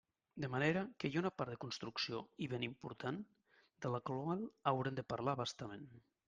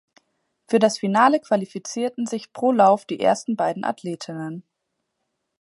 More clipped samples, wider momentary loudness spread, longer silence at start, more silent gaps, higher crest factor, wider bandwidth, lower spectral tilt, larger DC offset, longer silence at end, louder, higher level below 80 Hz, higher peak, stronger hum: neither; about the same, 12 LU vs 14 LU; second, 0.35 s vs 0.7 s; neither; about the same, 22 dB vs 20 dB; second, 9.6 kHz vs 11.5 kHz; about the same, -6 dB/octave vs -5 dB/octave; neither; second, 0.3 s vs 1 s; second, -42 LUFS vs -21 LUFS; about the same, -76 dBFS vs -74 dBFS; second, -20 dBFS vs -2 dBFS; neither